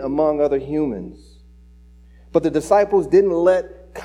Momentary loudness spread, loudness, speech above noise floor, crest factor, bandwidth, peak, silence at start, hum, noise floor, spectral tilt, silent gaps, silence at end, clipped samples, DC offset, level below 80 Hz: 12 LU; -18 LUFS; 28 dB; 16 dB; 11.5 kHz; -4 dBFS; 0 s; 60 Hz at -45 dBFS; -46 dBFS; -7 dB/octave; none; 0 s; under 0.1%; under 0.1%; -46 dBFS